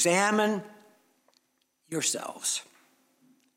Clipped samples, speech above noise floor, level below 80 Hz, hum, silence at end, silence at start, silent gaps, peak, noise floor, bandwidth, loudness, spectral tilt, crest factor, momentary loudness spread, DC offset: under 0.1%; 46 dB; -88 dBFS; none; 0.95 s; 0 s; none; -10 dBFS; -73 dBFS; 16.5 kHz; -28 LUFS; -2.5 dB/octave; 20 dB; 13 LU; under 0.1%